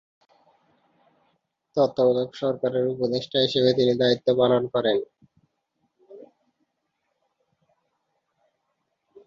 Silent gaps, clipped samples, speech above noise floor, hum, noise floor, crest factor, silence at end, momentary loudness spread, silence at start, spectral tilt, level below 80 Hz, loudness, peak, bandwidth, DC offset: none; under 0.1%; 55 dB; none; -77 dBFS; 18 dB; 3 s; 7 LU; 1.75 s; -6.5 dB/octave; -68 dBFS; -23 LUFS; -8 dBFS; 7.4 kHz; under 0.1%